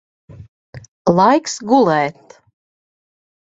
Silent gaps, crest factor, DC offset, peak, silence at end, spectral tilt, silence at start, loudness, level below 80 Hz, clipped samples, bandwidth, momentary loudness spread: 0.48-0.73 s, 0.88-1.05 s; 18 dB; under 0.1%; 0 dBFS; 1.3 s; -5.5 dB/octave; 0.3 s; -15 LUFS; -56 dBFS; under 0.1%; 8 kHz; 8 LU